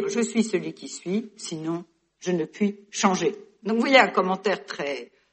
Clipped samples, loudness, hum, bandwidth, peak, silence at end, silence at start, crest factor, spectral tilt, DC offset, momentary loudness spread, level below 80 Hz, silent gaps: under 0.1%; -25 LUFS; none; 8.8 kHz; -2 dBFS; 0.3 s; 0 s; 24 dB; -4 dB/octave; under 0.1%; 17 LU; -72 dBFS; none